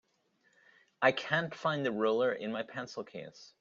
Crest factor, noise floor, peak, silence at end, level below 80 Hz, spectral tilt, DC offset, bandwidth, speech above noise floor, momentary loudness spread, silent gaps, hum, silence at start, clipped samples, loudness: 22 dB; -74 dBFS; -12 dBFS; 0.15 s; -78 dBFS; -5.5 dB/octave; under 0.1%; 7.4 kHz; 40 dB; 14 LU; none; none; 1 s; under 0.1%; -33 LUFS